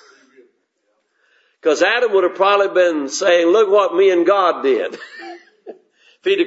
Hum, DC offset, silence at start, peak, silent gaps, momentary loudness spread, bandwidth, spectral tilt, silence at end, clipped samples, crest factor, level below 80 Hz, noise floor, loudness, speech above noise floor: none; under 0.1%; 1.65 s; -2 dBFS; none; 14 LU; 8 kHz; -2.5 dB/octave; 0 s; under 0.1%; 16 dB; -80 dBFS; -68 dBFS; -15 LUFS; 53 dB